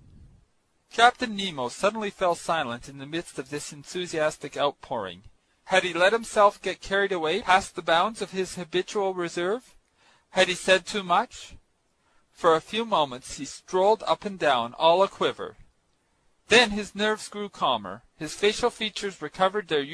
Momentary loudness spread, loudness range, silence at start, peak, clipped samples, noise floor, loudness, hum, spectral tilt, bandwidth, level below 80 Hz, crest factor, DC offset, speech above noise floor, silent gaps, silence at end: 14 LU; 5 LU; 0.95 s; -4 dBFS; under 0.1%; -69 dBFS; -25 LUFS; none; -3 dB/octave; 11 kHz; -58 dBFS; 24 dB; under 0.1%; 44 dB; none; 0 s